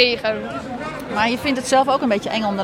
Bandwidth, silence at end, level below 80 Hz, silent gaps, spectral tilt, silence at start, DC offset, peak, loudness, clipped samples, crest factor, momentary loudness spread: 16.5 kHz; 0 s; -50 dBFS; none; -3.5 dB/octave; 0 s; under 0.1%; -2 dBFS; -20 LUFS; under 0.1%; 18 dB; 12 LU